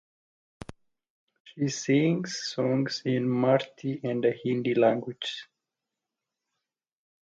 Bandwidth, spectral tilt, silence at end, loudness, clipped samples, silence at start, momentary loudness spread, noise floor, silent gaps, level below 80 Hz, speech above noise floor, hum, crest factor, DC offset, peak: 9 kHz; -5.5 dB/octave; 1.95 s; -27 LUFS; under 0.1%; 0.7 s; 14 LU; -87 dBFS; 1.10-1.27 s, 1.40-1.45 s; -68 dBFS; 61 dB; none; 22 dB; under 0.1%; -8 dBFS